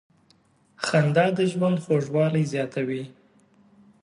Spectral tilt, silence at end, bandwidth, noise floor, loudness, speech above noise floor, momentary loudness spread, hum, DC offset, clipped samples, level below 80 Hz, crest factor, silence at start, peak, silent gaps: -6.5 dB/octave; 0.9 s; 11 kHz; -62 dBFS; -24 LUFS; 39 dB; 10 LU; none; under 0.1%; under 0.1%; -70 dBFS; 18 dB; 0.8 s; -6 dBFS; none